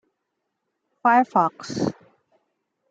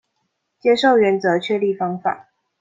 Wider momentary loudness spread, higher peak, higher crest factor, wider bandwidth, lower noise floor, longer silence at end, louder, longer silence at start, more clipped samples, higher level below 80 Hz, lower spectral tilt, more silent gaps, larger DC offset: about the same, 10 LU vs 10 LU; about the same, -4 dBFS vs -4 dBFS; about the same, 20 dB vs 16 dB; first, 8.8 kHz vs 7.8 kHz; first, -79 dBFS vs -73 dBFS; first, 1 s vs 0.4 s; second, -22 LUFS vs -18 LUFS; first, 1.05 s vs 0.65 s; neither; about the same, -68 dBFS vs -66 dBFS; about the same, -5.5 dB/octave vs -6 dB/octave; neither; neither